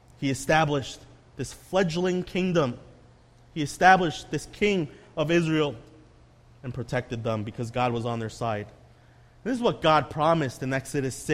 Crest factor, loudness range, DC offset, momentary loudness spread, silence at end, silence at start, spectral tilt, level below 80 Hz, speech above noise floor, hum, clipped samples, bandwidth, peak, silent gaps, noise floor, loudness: 24 dB; 6 LU; under 0.1%; 15 LU; 0 s; 0.2 s; -5.5 dB/octave; -52 dBFS; 29 dB; none; under 0.1%; 15 kHz; -4 dBFS; none; -55 dBFS; -26 LUFS